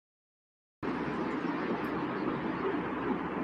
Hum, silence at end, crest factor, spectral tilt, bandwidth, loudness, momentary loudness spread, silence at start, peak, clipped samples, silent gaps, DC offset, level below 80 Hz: none; 0 s; 16 dB; -8 dB/octave; 13 kHz; -34 LUFS; 2 LU; 0.8 s; -20 dBFS; under 0.1%; none; under 0.1%; -60 dBFS